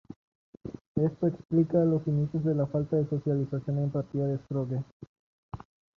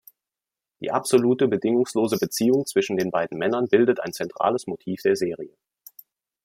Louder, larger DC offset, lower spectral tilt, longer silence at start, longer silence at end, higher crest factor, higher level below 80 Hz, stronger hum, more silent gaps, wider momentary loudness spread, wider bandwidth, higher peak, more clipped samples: second, -29 LUFS vs -23 LUFS; neither; first, -11.5 dB/octave vs -5 dB/octave; second, 0.1 s vs 0.8 s; second, 0.4 s vs 0.95 s; about the same, 18 dB vs 18 dB; first, -60 dBFS vs -68 dBFS; neither; first, 0.16-0.53 s, 0.81-0.95 s, 4.92-5.00 s, 5.07-5.49 s vs none; first, 20 LU vs 10 LU; second, 6 kHz vs 16.5 kHz; second, -12 dBFS vs -6 dBFS; neither